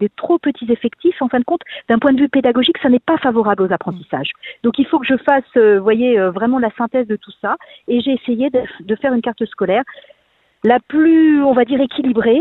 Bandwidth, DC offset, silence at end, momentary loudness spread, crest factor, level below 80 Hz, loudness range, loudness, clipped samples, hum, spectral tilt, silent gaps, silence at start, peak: 4.1 kHz; under 0.1%; 0 s; 10 LU; 14 dB; -54 dBFS; 4 LU; -15 LUFS; under 0.1%; none; -9 dB/octave; none; 0 s; 0 dBFS